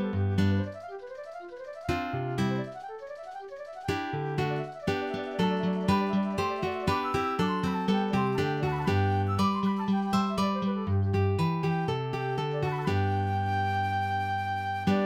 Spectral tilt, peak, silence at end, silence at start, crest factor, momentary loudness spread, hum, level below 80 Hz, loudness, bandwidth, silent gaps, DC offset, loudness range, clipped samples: -7 dB/octave; -12 dBFS; 0 s; 0 s; 16 dB; 14 LU; none; -54 dBFS; -29 LUFS; 15 kHz; none; under 0.1%; 5 LU; under 0.1%